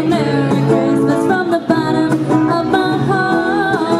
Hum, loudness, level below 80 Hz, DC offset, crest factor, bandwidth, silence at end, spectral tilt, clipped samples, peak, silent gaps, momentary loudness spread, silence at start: none; -14 LUFS; -48 dBFS; under 0.1%; 14 dB; 12.5 kHz; 0 s; -7 dB/octave; under 0.1%; 0 dBFS; none; 2 LU; 0 s